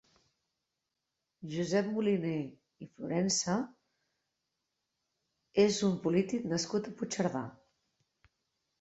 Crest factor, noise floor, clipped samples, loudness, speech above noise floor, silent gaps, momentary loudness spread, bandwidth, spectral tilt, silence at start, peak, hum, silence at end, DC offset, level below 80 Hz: 20 dB; -87 dBFS; under 0.1%; -32 LUFS; 55 dB; none; 16 LU; 8.2 kHz; -5 dB/octave; 1.4 s; -14 dBFS; none; 1.3 s; under 0.1%; -72 dBFS